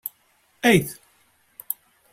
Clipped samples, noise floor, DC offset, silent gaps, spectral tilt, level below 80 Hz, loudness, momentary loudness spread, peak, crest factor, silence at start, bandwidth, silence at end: under 0.1%; -63 dBFS; under 0.1%; none; -4.5 dB/octave; -56 dBFS; -22 LUFS; 17 LU; -4 dBFS; 22 dB; 0.05 s; 16.5 kHz; 0.4 s